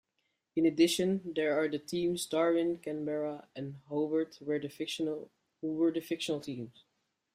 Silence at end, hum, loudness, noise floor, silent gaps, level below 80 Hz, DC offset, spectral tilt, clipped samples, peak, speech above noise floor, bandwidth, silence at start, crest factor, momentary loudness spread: 0.65 s; none; -33 LUFS; -81 dBFS; none; -74 dBFS; under 0.1%; -5 dB/octave; under 0.1%; -14 dBFS; 49 dB; 15.5 kHz; 0.55 s; 18 dB; 14 LU